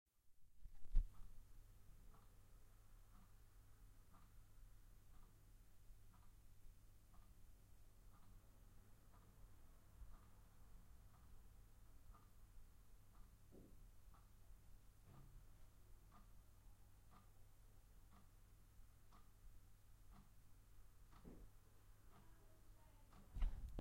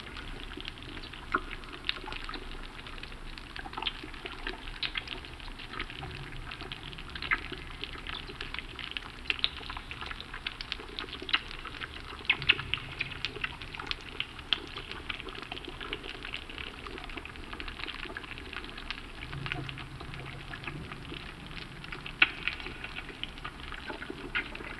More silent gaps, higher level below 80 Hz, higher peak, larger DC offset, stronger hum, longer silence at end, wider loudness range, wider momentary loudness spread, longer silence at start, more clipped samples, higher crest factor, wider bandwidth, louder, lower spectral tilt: neither; second, -56 dBFS vs -48 dBFS; second, -26 dBFS vs -4 dBFS; neither; neither; about the same, 0 s vs 0 s; first, 11 LU vs 8 LU; first, 19 LU vs 12 LU; first, 0.15 s vs 0 s; neither; about the same, 30 dB vs 32 dB; first, 16 kHz vs 12.5 kHz; second, -57 LUFS vs -36 LUFS; first, -5.5 dB/octave vs -4 dB/octave